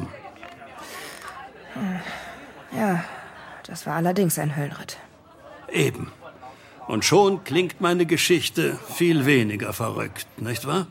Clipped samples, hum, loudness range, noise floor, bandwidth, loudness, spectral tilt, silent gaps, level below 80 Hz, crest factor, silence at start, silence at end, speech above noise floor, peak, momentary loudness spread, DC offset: under 0.1%; none; 10 LU; -47 dBFS; 16.5 kHz; -23 LUFS; -4.5 dB/octave; none; -62 dBFS; 20 dB; 0 s; 0 s; 24 dB; -4 dBFS; 22 LU; under 0.1%